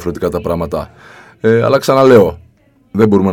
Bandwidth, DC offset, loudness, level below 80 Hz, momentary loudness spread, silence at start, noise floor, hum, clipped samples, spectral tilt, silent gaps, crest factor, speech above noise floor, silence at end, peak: 18.5 kHz; under 0.1%; -12 LUFS; -38 dBFS; 15 LU; 0 s; -50 dBFS; none; 0.4%; -7 dB/octave; none; 12 dB; 38 dB; 0 s; 0 dBFS